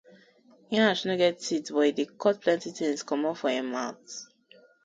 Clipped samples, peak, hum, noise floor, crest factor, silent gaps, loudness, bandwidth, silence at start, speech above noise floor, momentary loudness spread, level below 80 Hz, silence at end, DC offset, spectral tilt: under 0.1%; -10 dBFS; none; -59 dBFS; 18 dB; none; -27 LUFS; 9.4 kHz; 0.7 s; 32 dB; 10 LU; -74 dBFS; 0.6 s; under 0.1%; -4 dB/octave